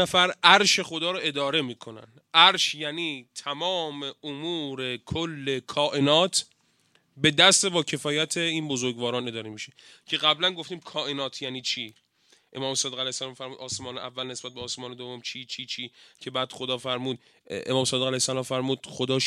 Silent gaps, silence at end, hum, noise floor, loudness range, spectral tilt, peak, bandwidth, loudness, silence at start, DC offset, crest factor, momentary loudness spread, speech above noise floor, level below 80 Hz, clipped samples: none; 0 s; none; -66 dBFS; 10 LU; -2.5 dB/octave; 0 dBFS; 15.5 kHz; -25 LUFS; 0 s; under 0.1%; 26 dB; 18 LU; 39 dB; -66 dBFS; under 0.1%